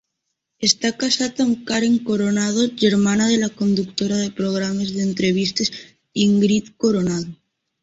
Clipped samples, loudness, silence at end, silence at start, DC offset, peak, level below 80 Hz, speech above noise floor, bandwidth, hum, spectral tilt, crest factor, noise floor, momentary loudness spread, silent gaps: under 0.1%; -19 LUFS; 0.5 s; 0.6 s; under 0.1%; -2 dBFS; -56 dBFS; 58 dB; 8 kHz; none; -4.5 dB/octave; 16 dB; -77 dBFS; 6 LU; none